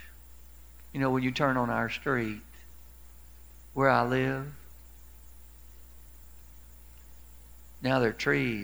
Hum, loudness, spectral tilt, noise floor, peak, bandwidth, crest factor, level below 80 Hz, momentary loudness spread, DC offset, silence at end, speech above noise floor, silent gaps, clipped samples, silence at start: none; -29 LUFS; -6.5 dB/octave; -52 dBFS; -8 dBFS; over 20 kHz; 24 dB; -52 dBFS; 19 LU; 0.2%; 0 s; 24 dB; none; under 0.1%; 0 s